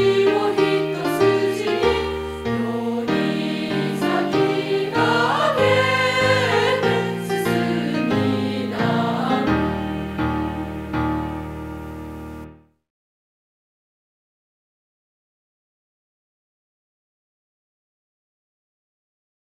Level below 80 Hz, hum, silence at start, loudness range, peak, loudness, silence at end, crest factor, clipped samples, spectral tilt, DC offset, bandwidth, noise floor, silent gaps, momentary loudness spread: -44 dBFS; none; 0 s; 12 LU; -6 dBFS; -20 LUFS; 6.9 s; 18 dB; under 0.1%; -6 dB/octave; under 0.1%; 16 kHz; -42 dBFS; none; 11 LU